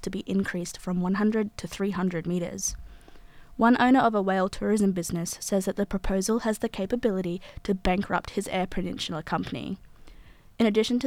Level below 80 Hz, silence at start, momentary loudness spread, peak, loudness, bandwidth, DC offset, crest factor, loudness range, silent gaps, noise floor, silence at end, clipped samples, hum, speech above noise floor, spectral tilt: -44 dBFS; 0 s; 10 LU; -10 dBFS; -27 LUFS; 16 kHz; under 0.1%; 16 dB; 5 LU; none; -49 dBFS; 0 s; under 0.1%; none; 23 dB; -5 dB/octave